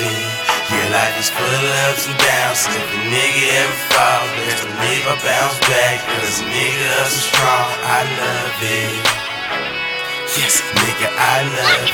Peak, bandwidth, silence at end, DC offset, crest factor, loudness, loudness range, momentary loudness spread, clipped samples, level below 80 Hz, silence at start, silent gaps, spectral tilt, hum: 0 dBFS; 19.5 kHz; 0 s; under 0.1%; 16 dB; -15 LUFS; 2 LU; 6 LU; under 0.1%; -50 dBFS; 0 s; none; -2 dB/octave; none